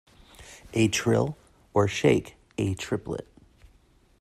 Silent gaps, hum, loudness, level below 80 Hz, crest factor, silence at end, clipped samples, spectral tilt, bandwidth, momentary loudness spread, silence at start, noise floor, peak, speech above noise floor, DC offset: none; none; -26 LUFS; -54 dBFS; 20 dB; 1 s; under 0.1%; -5.5 dB/octave; 14.5 kHz; 17 LU; 0.4 s; -61 dBFS; -8 dBFS; 36 dB; under 0.1%